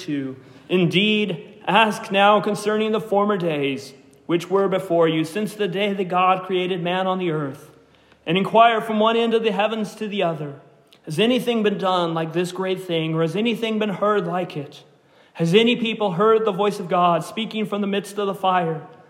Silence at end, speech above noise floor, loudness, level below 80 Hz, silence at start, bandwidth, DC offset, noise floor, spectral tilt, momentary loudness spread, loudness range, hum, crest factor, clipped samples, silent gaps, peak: 0.15 s; 33 dB; -21 LUFS; -72 dBFS; 0 s; 16 kHz; under 0.1%; -53 dBFS; -5.5 dB/octave; 10 LU; 3 LU; none; 20 dB; under 0.1%; none; -2 dBFS